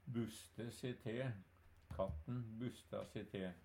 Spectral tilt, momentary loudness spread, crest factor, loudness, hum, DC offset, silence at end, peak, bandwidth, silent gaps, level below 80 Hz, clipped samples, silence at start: -6.5 dB/octave; 6 LU; 20 dB; -48 LUFS; none; under 0.1%; 0 s; -28 dBFS; 16.5 kHz; none; -64 dBFS; under 0.1%; 0.05 s